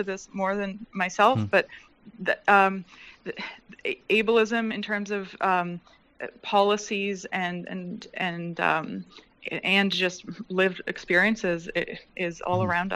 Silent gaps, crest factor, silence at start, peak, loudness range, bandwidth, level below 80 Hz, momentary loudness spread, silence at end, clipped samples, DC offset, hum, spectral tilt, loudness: none; 22 dB; 0 s; -4 dBFS; 3 LU; 14 kHz; -62 dBFS; 16 LU; 0 s; under 0.1%; under 0.1%; none; -5 dB/octave; -26 LUFS